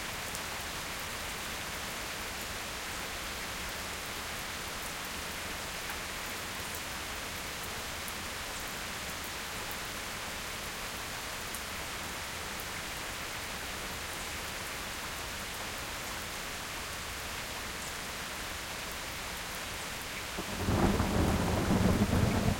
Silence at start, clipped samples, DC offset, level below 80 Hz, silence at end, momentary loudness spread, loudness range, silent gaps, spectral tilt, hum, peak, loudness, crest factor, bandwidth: 0 s; under 0.1%; under 0.1%; -48 dBFS; 0 s; 8 LU; 4 LU; none; -3.5 dB/octave; none; -14 dBFS; -36 LUFS; 22 dB; 17 kHz